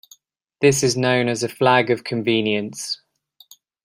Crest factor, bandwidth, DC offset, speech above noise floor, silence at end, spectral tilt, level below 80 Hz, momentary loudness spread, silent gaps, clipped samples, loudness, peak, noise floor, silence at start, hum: 20 dB; 16 kHz; under 0.1%; 37 dB; 0.9 s; -4 dB/octave; -60 dBFS; 11 LU; none; under 0.1%; -20 LUFS; -2 dBFS; -56 dBFS; 0.6 s; none